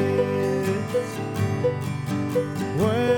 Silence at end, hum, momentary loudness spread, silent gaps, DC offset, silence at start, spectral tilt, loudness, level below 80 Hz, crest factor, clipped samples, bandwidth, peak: 0 s; none; 5 LU; none; under 0.1%; 0 s; -7 dB/octave; -25 LUFS; -54 dBFS; 16 dB; under 0.1%; 19 kHz; -8 dBFS